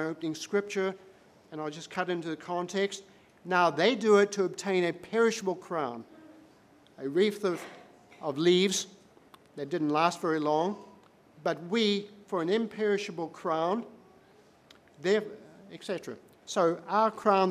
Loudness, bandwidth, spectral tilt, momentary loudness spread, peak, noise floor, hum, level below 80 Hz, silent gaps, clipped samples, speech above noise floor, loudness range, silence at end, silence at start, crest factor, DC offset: -29 LUFS; 14.5 kHz; -4.5 dB/octave; 18 LU; -10 dBFS; -60 dBFS; none; -80 dBFS; none; under 0.1%; 31 dB; 6 LU; 0 s; 0 s; 20 dB; under 0.1%